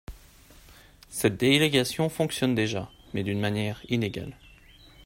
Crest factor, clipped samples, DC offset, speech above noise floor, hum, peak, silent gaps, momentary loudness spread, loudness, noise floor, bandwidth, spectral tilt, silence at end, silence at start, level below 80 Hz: 22 dB; under 0.1%; under 0.1%; 27 dB; none; -6 dBFS; none; 14 LU; -26 LUFS; -53 dBFS; 16.5 kHz; -5 dB/octave; 0.05 s; 0.1 s; -54 dBFS